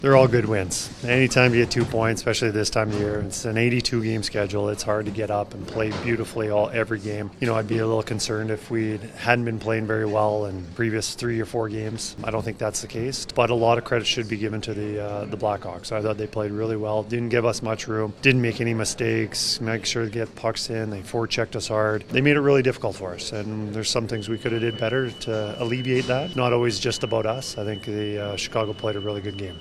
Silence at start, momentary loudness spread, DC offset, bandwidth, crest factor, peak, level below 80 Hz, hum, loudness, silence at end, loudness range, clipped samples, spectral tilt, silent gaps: 0 s; 9 LU; under 0.1%; 13.5 kHz; 24 dB; 0 dBFS; -48 dBFS; none; -24 LUFS; 0 s; 4 LU; under 0.1%; -5 dB/octave; none